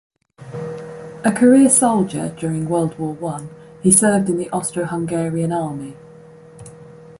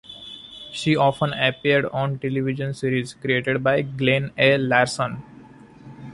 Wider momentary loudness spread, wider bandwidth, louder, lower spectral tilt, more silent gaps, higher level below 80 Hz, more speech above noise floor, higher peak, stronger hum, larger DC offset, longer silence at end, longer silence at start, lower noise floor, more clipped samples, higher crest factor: about the same, 19 LU vs 18 LU; about the same, 12 kHz vs 11.5 kHz; first, -17 LUFS vs -21 LUFS; about the same, -5.5 dB/octave vs -5.5 dB/octave; neither; about the same, -56 dBFS vs -56 dBFS; about the same, 25 dB vs 24 dB; about the same, -2 dBFS vs -4 dBFS; neither; neither; about the same, 0.05 s vs 0 s; first, 0.4 s vs 0.1 s; about the same, -42 dBFS vs -45 dBFS; neither; about the same, 18 dB vs 20 dB